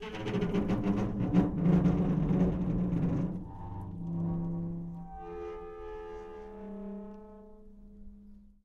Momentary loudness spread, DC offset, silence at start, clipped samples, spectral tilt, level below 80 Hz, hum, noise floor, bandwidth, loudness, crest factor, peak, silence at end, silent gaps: 17 LU; under 0.1%; 0 s; under 0.1%; -9.5 dB/octave; -46 dBFS; none; -53 dBFS; 6.8 kHz; -32 LUFS; 18 dB; -14 dBFS; 0.2 s; none